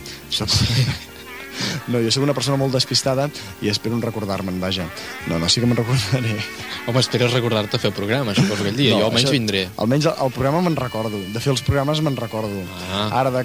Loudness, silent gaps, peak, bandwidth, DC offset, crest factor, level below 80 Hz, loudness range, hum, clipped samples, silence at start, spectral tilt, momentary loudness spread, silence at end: -20 LUFS; none; -4 dBFS; 17.5 kHz; 0.1%; 18 dB; -44 dBFS; 3 LU; none; under 0.1%; 0 s; -5 dB/octave; 9 LU; 0 s